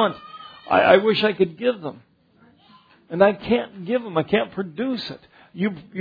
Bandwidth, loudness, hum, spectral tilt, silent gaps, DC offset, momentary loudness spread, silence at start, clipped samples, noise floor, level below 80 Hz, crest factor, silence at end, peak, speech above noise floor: 5 kHz; -21 LUFS; none; -8 dB/octave; none; under 0.1%; 19 LU; 0 s; under 0.1%; -56 dBFS; -58 dBFS; 20 dB; 0 s; -2 dBFS; 35 dB